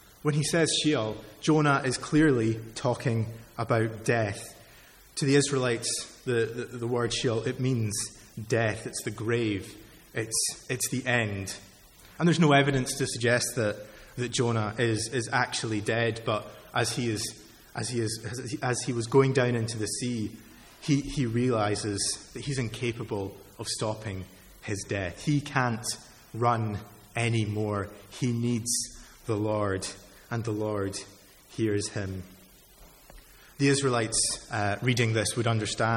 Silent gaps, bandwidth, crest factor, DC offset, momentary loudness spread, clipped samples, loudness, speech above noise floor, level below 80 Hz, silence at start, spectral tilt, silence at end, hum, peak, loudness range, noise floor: none; 17 kHz; 22 dB; under 0.1%; 13 LU; under 0.1%; -28 LUFS; 26 dB; -56 dBFS; 0.25 s; -4.5 dB/octave; 0 s; none; -8 dBFS; 5 LU; -54 dBFS